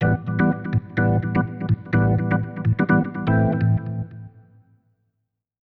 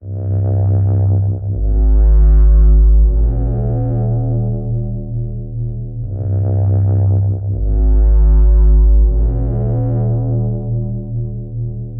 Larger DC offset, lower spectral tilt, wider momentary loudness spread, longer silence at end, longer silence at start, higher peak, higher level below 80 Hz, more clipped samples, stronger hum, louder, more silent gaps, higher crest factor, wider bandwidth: neither; second, -11 dB/octave vs -14.5 dB/octave; second, 6 LU vs 11 LU; first, 1.45 s vs 0 s; about the same, 0 s vs 0 s; about the same, -6 dBFS vs -4 dBFS; second, -44 dBFS vs -14 dBFS; neither; neither; second, -22 LUFS vs -16 LUFS; neither; first, 16 dB vs 10 dB; first, 4.4 kHz vs 1.6 kHz